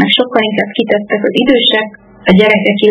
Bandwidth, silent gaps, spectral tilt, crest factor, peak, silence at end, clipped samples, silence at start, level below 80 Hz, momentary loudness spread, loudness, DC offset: 5.4 kHz; none; -7.5 dB/octave; 10 dB; 0 dBFS; 0 s; 0.6%; 0 s; -46 dBFS; 7 LU; -11 LUFS; under 0.1%